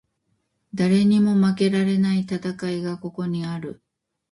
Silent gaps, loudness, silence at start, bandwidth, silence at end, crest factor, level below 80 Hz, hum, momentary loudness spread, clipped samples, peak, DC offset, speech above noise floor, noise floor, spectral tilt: none; -22 LUFS; 0.75 s; 11 kHz; 0.6 s; 14 dB; -62 dBFS; none; 13 LU; under 0.1%; -8 dBFS; under 0.1%; 51 dB; -72 dBFS; -7.5 dB/octave